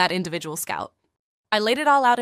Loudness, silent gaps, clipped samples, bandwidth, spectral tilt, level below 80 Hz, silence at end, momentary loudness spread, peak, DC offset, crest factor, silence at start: -22 LUFS; 1.19-1.44 s; under 0.1%; 15.5 kHz; -3 dB/octave; -66 dBFS; 0 s; 12 LU; -4 dBFS; under 0.1%; 18 dB; 0 s